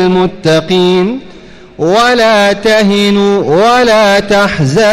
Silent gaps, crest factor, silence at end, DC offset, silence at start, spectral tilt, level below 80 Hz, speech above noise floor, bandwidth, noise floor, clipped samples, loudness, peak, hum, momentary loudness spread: none; 8 dB; 0 s; under 0.1%; 0 s; -5 dB/octave; -40 dBFS; 25 dB; 15.5 kHz; -33 dBFS; under 0.1%; -8 LUFS; 0 dBFS; none; 5 LU